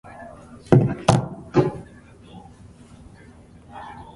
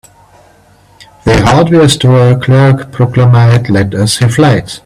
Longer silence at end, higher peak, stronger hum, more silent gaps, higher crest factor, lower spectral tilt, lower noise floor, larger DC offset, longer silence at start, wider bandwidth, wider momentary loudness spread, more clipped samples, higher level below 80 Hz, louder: about the same, 0.1 s vs 0.05 s; about the same, 0 dBFS vs 0 dBFS; second, none vs 50 Hz at -35 dBFS; neither; first, 24 dB vs 8 dB; about the same, -7 dB/octave vs -6 dB/octave; first, -47 dBFS vs -43 dBFS; neither; second, 0.2 s vs 1.25 s; second, 11.5 kHz vs 13 kHz; first, 26 LU vs 5 LU; neither; second, -48 dBFS vs -32 dBFS; second, -20 LUFS vs -8 LUFS